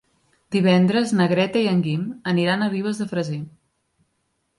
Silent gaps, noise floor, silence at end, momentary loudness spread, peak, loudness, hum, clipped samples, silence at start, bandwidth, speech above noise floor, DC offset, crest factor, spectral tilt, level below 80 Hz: none; -71 dBFS; 1.1 s; 9 LU; -4 dBFS; -21 LUFS; none; under 0.1%; 0.5 s; 11.5 kHz; 51 dB; under 0.1%; 18 dB; -6.5 dB/octave; -64 dBFS